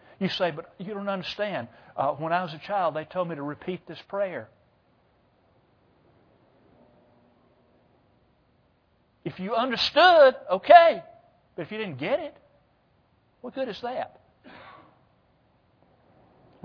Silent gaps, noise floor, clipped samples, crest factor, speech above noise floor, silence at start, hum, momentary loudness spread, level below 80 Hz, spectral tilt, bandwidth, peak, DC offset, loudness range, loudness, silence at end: none; -66 dBFS; under 0.1%; 26 dB; 42 dB; 0.2 s; none; 23 LU; -70 dBFS; -5.5 dB/octave; 5.4 kHz; 0 dBFS; under 0.1%; 18 LU; -24 LUFS; 1.95 s